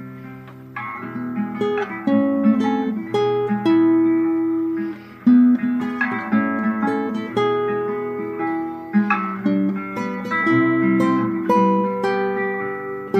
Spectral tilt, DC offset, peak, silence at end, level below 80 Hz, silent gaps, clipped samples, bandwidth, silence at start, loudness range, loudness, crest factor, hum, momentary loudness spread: -8 dB/octave; under 0.1%; -4 dBFS; 0 s; -70 dBFS; none; under 0.1%; 8.4 kHz; 0 s; 4 LU; -20 LUFS; 16 dB; none; 11 LU